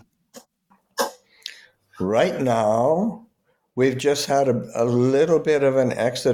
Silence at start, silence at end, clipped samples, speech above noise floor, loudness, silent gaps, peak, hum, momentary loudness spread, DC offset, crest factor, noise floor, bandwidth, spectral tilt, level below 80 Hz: 0.35 s; 0 s; under 0.1%; 43 dB; -21 LUFS; none; -8 dBFS; none; 16 LU; under 0.1%; 14 dB; -63 dBFS; 18 kHz; -5.5 dB/octave; -62 dBFS